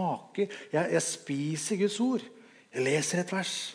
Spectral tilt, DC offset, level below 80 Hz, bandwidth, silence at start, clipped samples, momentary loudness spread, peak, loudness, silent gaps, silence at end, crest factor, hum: -4 dB/octave; under 0.1%; -86 dBFS; 10.5 kHz; 0 s; under 0.1%; 6 LU; -14 dBFS; -30 LUFS; none; 0 s; 16 dB; none